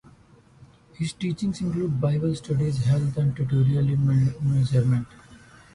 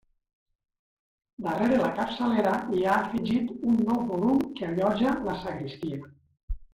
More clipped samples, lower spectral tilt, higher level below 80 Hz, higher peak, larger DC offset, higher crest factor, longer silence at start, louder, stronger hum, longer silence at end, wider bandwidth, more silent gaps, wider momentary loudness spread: neither; about the same, -8 dB/octave vs -7 dB/octave; about the same, -50 dBFS vs -48 dBFS; about the same, -10 dBFS vs -12 dBFS; neither; about the same, 14 dB vs 16 dB; second, 1 s vs 1.4 s; first, -24 LUFS vs -27 LUFS; neither; first, 0.4 s vs 0.1 s; second, 11 kHz vs 13.5 kHz; second, none vs 6.43-6.48 s; second, 7 LU vs 11 LU